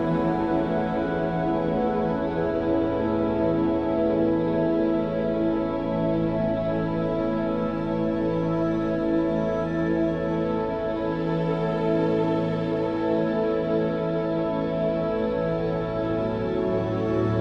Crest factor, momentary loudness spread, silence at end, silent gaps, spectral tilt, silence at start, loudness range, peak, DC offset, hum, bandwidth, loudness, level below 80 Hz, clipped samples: 12 dB; 3 LU; 0 s; none; -9.5 dB/octave; 0 s; 2 LU; -12 dBFS; under 0.1%; none; 6.2 kHz; -25 LUFS; -44 dBFS; under 0.1%